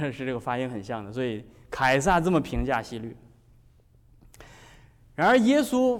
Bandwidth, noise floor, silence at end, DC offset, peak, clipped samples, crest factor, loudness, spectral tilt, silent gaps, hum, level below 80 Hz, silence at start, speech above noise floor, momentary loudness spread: 17 kHz; -58 dBFS; 0 s; under 0.1%; -12 dBFS; under 0.1%; 14 dB; -25 LUFS; -5.5 dB/octave; none; none; -44 dBFS; 0 s; 33 dB; 18 LU